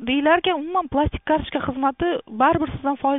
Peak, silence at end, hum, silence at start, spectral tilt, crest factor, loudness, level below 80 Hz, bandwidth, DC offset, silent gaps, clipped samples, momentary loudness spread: -4 dBFS; 0 s; none; 0 s; -3.5 dB/octave; 16 dB; -21 LUFS; -40 dBFS; 3.9 kHz; under 0.1%; none; under 0.1%; 6 LU